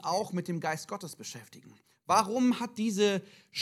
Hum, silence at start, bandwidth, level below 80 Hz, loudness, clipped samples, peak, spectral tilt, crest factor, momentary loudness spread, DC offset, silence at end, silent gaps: none; 0 s; 15 kHz; -82 dBFS; -30 LUFS; under 0.1%; -10 dBFS; -4.5 dB/octave; 22 dB; 15 LU; under 0.1%; 0 s; none